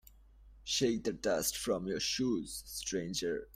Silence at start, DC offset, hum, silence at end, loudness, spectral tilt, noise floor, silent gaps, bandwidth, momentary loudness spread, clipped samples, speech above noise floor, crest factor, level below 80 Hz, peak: 0.35 s; under 0.1%; none; 0.1 s; -35 LUFS; -3 dB/octave; -59 dBFS; none; 16 kHz; 6 LU; under 0.1%; 24 dB; 18 dB; -58 dBFS; -18 dBFS